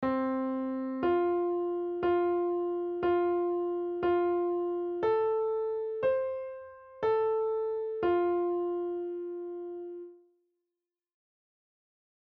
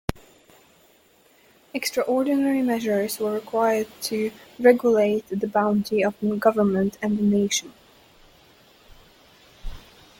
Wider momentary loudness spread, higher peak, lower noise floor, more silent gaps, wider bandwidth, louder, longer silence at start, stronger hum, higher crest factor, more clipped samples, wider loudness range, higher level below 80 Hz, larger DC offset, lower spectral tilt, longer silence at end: about the same, 11 LU vs 9 LU; second, -18 dBFS vs -4 dBFS; first, -90 dBFS vs -58 dBFS; neither; second, 4.5 kHz vs 17 kHz; second, -31 LUFS vs -23 LUFS; about the same, 0 s vs 0.1 s; neither; second, 12 dB vs 20 dB; neither; about the same, 7 LU vs 5 LU; second, -66 dBFS vs -48 dBFS; neither; about the same, -5.5 dB/octave vs -5 dB/octave; first, 2.1 s vs 0.4 s